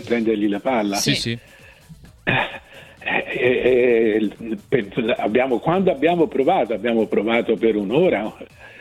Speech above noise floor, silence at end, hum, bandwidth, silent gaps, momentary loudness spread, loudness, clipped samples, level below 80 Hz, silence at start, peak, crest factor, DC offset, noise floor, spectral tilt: 25 dB; 0.05 s; none; 15 kHz; none; 11 LU; -20 LUFS; under 0.1%; -52 dBFS; 0 s; -4 dBFS; 16 dB; under 0.1%; -45 dBFS; -5 dB/octave